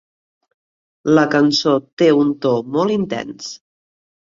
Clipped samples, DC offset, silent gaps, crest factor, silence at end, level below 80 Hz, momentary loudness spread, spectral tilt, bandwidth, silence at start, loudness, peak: under 0.1%; under 0.1%; 1.93-1.97 s; 16 dB; 0.65 s; -60 dBFS; 13 LU; -5.5 dB/octave; 7.6 kHz; 1.05 s; -16 LUFS; -2 dBFS